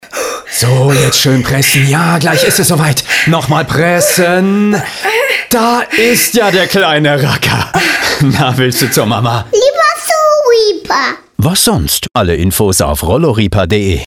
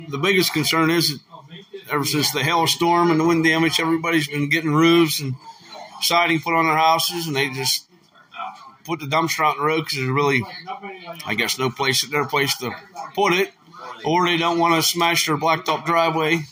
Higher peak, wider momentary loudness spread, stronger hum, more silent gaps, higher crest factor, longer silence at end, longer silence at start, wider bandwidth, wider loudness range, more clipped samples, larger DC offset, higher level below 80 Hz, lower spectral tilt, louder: about the same, 0 dBFS vs -2 dBFS; second, 4 LU vs 17 LU; neither; neither; second, 10 dB vs 18 dB; about the same, 0 s vs 0.05 s; about the same, 0.05 s vs 0 s; first, over 20 kHz vs 16 kHz; second, 1 LU vs 4 LU; neither; neither; first, -32 dBFS vs -64 dBFS; about the same, -4 dB/octave vs -3.5 dB/octave; first, -10 LUFS vs -19 LUFS